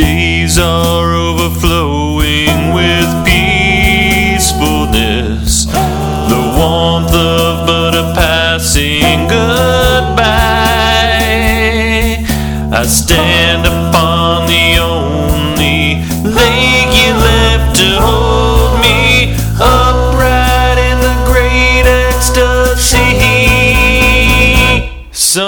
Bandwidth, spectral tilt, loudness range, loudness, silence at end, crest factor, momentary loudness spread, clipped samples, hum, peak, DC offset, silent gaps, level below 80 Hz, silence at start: over 20 kHz; -4 dB/octave; 3 LU; -9 LUFS; 0 s; 10 dB; 6 LU; 0.4%; none; 0 dBFS; under 0.1%; none; -16 dBFS; 0 s